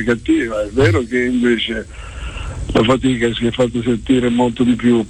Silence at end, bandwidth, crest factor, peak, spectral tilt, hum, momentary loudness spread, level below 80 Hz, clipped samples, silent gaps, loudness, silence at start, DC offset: 0 s; 10 kHz; 14 dB; -2 dBFS; -6 dB/octave; none; 13 LU; -32 dBFS; under 0.1%; none; -16 LUFS; 0 s; 0.1%